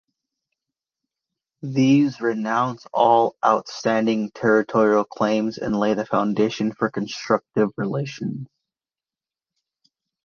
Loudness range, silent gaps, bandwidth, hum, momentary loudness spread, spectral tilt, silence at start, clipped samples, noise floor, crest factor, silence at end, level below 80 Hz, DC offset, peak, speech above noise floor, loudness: 6 LU; none; 7 kHz; none; 9 LU; -6.5 dB/octave; 1.65 s; under 0.1%; under -90 dBFS; 20 dB; 1.8 s; -62 dBFS; under 0.1%; -2 dBFS; over 69 dB; -21 LUFS